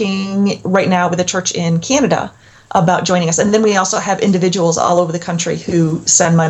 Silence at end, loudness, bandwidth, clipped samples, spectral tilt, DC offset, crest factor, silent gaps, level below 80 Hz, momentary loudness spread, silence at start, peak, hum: 0 s; -14 LUFS; 9.2 kHz; under 0.1%; -4.5 dB/octave; under 0.1%; 14 dB; none; -50 dBFS; 6 LU; 0 s; 0 dBFS; none